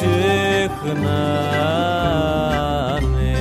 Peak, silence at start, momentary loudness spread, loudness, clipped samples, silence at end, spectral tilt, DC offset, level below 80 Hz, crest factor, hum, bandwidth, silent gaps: -6 dBFS; 0 s; 4 LU; -19 LUFS; under 0.1%; 0 s; -6 dB/octave; under 0.1%; -28 dBFS; 12 dB; none; 15 kHz; none